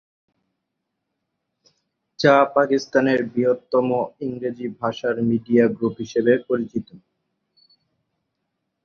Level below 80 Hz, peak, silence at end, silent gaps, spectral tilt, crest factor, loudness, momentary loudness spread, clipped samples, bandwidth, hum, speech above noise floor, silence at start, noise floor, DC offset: -64 dBFS; -2 dBFS; 1.85 s; none; -6.5 dB/octave; 20 dB; -21 LUFS; 11 LU; under 0.1%; 7 kHz; none; 59 dB; 2.2 s; -79 dBFS; under 0.1%